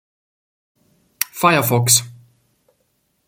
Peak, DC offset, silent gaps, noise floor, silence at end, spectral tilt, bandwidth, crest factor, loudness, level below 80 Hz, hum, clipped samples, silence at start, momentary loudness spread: 0 dBFS; under 0.1%; none; -67 dBFS; 1.15 s; -3 dB/octave; 17 kHz; 22 dB; -16 LUFS; -60 dBFS; none; under 0.1%; 1.2 s; 12 LU